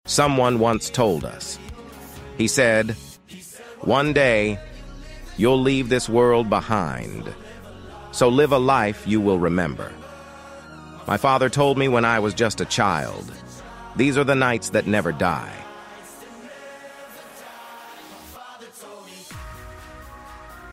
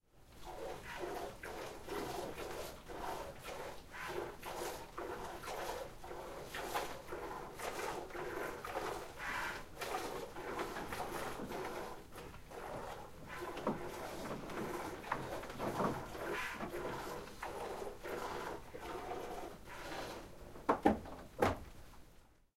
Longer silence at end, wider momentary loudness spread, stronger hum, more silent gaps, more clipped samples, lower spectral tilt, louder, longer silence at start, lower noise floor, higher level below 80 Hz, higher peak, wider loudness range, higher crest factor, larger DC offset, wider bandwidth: second, 0 s vs 0.2 s; first, 23 LU vs 10 LU; neither; neither; neither; about the same, -5 dB/octave vs -4.5 dB/octave; first, -20 LUFS vs -44 LUFS; about the same, 0.05 s vs 0.15 s; second, -42 dBFS vs -63 dBFS; first, -46 dBFS vs -58 dBFS; first, -4 dBFS vs -14 dBFS; first, 19 LU vs 5 LU; second, 18 dB vs 30 dB; neither; about the same, 16 kHz vs 16 kHz